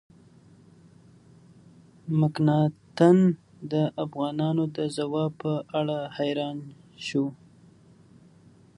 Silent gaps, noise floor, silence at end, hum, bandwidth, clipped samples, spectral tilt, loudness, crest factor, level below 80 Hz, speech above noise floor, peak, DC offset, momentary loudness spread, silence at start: none; -55 dBFS; 1.45 s; none; 11 kHz; under 0.1%; -7.5 dB/octave; -26 LUFS; 22 dB; -70 dBFS; 30 dB; -6 dBFS; under 0.1%; 13 LU; 2.05 s